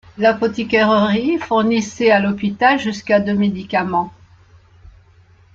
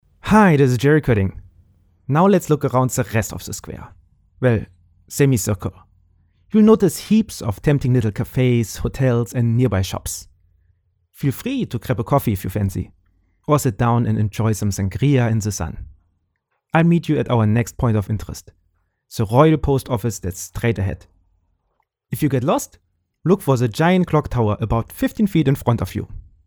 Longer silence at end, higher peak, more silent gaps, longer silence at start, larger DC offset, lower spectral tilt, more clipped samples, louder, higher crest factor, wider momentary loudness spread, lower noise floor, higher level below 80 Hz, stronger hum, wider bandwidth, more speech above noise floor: first, 1.45 s vs 0.25 s; about the same, -2 dBFS vs 0 dBFS; neither; about the same, 0.15 s vs 0.25 s; neither; about the same, -5.5 dB/octave vs -6.5 dB/octave; neither; about the same, -17 LUFS vs -19 LUFS; about the same, 16 dB vs 18 dB; second, 6 LU vs 15 LU; second, -49 dBFS vs -71 dBFS; second, -52 dBFS vs -40 dBFS; neither; second, 7.6 kHz vs over 20 kHz; second, 33 dB vs 54 dB